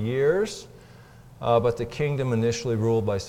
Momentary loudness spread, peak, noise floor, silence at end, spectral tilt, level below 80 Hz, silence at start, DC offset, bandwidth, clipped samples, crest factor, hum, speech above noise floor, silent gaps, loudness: 7 LU; -8 dBFS; -48 dBFS; 0 s; -6.5 dB/octave; -52 dBFS; 0 s; under 0.1%; 15.5 kHz; under 0.1%; 16 dB; none; 24 dB; none; -25 LUFS